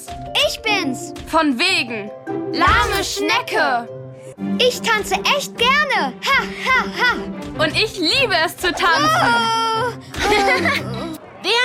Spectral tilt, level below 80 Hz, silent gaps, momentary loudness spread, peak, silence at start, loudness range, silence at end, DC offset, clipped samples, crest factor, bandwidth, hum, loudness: -3 dB/octave; -40 dBFS; none; 12 LU; -2 dBFS; 0 s; 2 LU; 0 s; under 0.1%; under 0.1%; 16 dB; 17 kHz; none; -17 LUFS